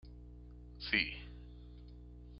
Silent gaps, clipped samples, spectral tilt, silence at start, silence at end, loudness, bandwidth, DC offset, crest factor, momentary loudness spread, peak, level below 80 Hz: none; under 0.1%; -1.5 dB/octave; 0 s; 0 s; -36 LUFS; 5.8 kHz; under 0.1%; 28 dB; 22 LU; -16 dBFS; -54 dBFS